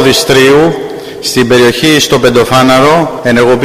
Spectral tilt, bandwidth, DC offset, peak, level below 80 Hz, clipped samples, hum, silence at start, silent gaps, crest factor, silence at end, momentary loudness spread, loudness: -4 dB/octave; 16.5 kHz; under 0.1%; 0 dBFS; -36 dBFS; 0.5%; none; 0 s; none; 6 dB; 0 s; 7 LU; -7 LUFS